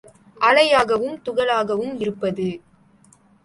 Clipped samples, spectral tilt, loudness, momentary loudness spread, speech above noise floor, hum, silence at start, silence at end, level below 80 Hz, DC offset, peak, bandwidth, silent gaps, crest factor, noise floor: under 0.1%; -4.5 dB/octave; -20 LUFS; 12 LU; 35 dB; none; 0.4 s; 0.85 s; -60 dBFS; under 0.1%; -2 dBFS; 11.5 kHz; none; 18 dB; -54 dBFS